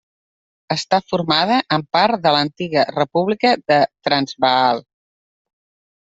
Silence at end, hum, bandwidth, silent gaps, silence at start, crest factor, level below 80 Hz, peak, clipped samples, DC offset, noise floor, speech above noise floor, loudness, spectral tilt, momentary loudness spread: 1.2 s; none; 8 kHz; none; 0.7 s; 18 dB; -60 dBFS; -2 dBFS; under 0.1%; under 0.1%; under -90 dBFS; over 73 dB; -17 LUFS; -5 dB/octave; 4 LU